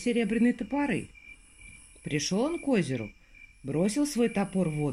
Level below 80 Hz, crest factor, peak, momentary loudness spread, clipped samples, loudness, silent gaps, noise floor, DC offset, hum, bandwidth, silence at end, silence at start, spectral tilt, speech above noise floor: -56 dBFS; 16 dB; -14 dBFS; 22 LU; under 0.1%; -29 LUFS; none; -52 dBFS; under 0.1%; none; 14 kHz; 0 s; 0 s; -5.5 dB/octave; 24 dB